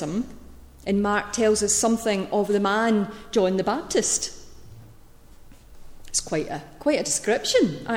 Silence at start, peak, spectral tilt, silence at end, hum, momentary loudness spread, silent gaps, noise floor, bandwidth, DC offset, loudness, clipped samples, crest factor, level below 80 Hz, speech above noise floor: 0 s; -8 dBFS; -3.5 dB/octave; 0 s; none; 8 LU; none; -47 dBFS; 17 kHz; under 0.1%; -23 LUFS; under 0.1%; 16 dB; -48 dBFS; 24 dB